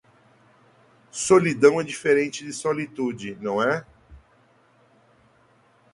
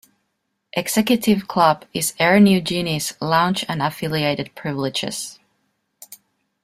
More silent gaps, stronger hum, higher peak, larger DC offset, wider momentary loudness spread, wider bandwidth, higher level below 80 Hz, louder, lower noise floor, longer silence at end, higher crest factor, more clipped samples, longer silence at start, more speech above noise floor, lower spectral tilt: neither; neither; about the same, -4 dBFS vs -2 dBFS; neither; about the same, 11 LU vs 12 LU; second, 11.5 kHz vs 16 kHz; second, -62 dBFS vs -56 dBFS; second, -22 LUFS vs -19 LUFS; second, -59 dBFS vs -74 dBFS; first, 1.75 s vs 0.5 s; about the same, 22 dB vs 18 dB; neither; first, 1.15 s vs 0.75 s; second, 38 dB vs 55 dB; about the same, -4.5 dB/octave vs -4.5 dB/octave